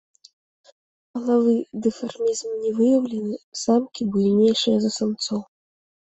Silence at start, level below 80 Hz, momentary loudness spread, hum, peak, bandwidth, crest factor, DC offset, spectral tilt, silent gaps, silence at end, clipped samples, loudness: 1.15 s; -64 dBFS; 10 LU; none; -8 dBFS; 8.2 kHz; 14 dB; under 0.1%; -5.5 dB/octave; 3.43-3.52 s; 0.7 s; under 0.1%; -22 LUFS